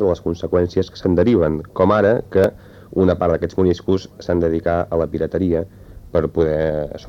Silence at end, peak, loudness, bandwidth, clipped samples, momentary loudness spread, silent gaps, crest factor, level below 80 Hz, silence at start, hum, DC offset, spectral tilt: 0 s; -4 dBFS; -19 LUFS; 7.8 kHz; under 0.1%; 7 LU; none; 14 dB; -38 dBFS; 0 s; none; under 0.1%; -8.5 dB/octave